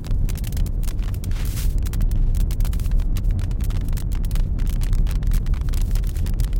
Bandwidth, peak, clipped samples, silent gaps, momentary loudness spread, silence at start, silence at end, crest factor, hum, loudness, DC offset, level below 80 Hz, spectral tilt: 17 kHz; -8 dBFS; under 0.1%; none; 3 LU; 0 s; 0 s; 12 dB; none; -25 LUFS; under 0.1%; -20 dBFS; -6 dB/octave